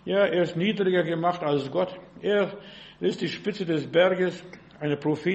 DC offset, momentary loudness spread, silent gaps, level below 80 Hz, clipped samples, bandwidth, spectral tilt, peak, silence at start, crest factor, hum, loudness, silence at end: under 0.1%; 11 LU; none; -66 dBFS; under 0.1%; 8.4 kHz; -6.5 dB/octave; -10 dBFS; 0.05 s; 16 dB; none; -26 LUFS; 0 s